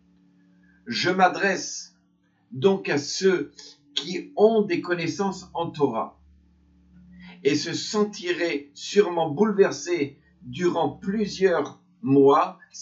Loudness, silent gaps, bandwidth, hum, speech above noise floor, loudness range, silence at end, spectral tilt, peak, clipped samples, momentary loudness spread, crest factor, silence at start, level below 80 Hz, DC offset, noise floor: -24 LUFS; none; 7.8 kHz; none; 42 dB; 4 LU; 0 s; -4.5 dB/octave; -4 dBFS; under 0.1%; 12 LU; 20 dB; 0.85 s; -64 dBFS; under 0.1%; -65 dBFS